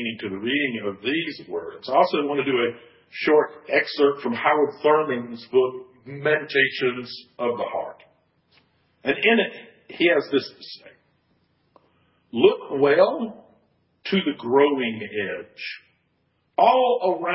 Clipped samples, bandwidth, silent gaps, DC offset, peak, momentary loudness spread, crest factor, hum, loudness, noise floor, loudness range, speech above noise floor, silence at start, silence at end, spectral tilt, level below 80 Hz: under 0.1%; 5.8 kHz; none; under 0.1%; -2 dBFS; 15 LU; 20 dB; none; -22 LUFS; -69 dBFS; 4 LU; 47 dB; 0 s; 0 s; -9 dB/octave; -68 dBFS